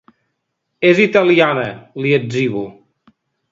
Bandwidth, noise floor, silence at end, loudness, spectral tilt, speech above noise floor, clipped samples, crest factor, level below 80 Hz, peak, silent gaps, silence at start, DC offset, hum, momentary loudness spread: 7.6 kHz; -73 dBFS; 0.8 s; -15 LUFS; -6.5 dB/octave; 59 dB; under 0.1%; 16 dB; -60 dBFS; 0 dBFS; none; 0.8 s; under 0.1%; none; 14 LU